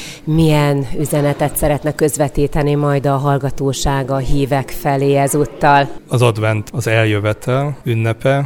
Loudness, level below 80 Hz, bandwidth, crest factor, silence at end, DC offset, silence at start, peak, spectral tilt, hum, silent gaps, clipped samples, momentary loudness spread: -16 LUFS; -30 dBFS; 18 kHz; 14 dB; 0 s; under 0.1%; 0 s; 0 dBFS; -6 dB/octave; none; none; under 0.1%; 6 LU